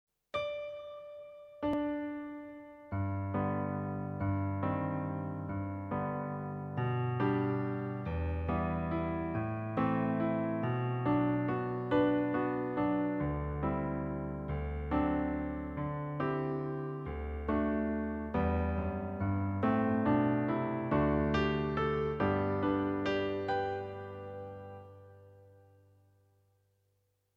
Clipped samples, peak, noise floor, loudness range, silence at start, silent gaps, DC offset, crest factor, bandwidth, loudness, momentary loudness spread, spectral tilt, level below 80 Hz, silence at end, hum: under 0.1%; -18 dBFS; -77 dBFS; 6 LU; 0.35 s; none; under 0.1%; 16 dB; 6.6 kHz; -34 LUFS; 11 LU; -9.5 dB/octave; -48 dBFS; 1.85 s; none